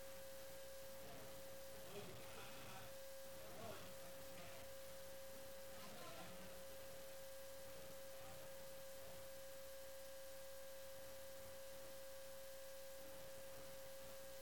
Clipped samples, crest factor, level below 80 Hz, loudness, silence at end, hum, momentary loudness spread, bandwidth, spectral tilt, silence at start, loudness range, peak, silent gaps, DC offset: under 0.1%; 16 dB; -74 dBFS; -56 LUFS; 0 s; none; 1 LU; 17.5 kHz; -2.5 dB/octave; 0 s; 1 LU; -40 dBFS; none; 0.1%